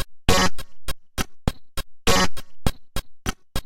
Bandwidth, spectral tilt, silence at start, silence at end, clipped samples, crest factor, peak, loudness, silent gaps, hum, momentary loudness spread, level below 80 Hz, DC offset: 17 kHz; -3.5 dB/octave; 0 s; 0 s; under 0.1%; 20 dB; -2 dBFS; -25 LUFS; none; none; 16 LU; -32 dBFS; under 0.1%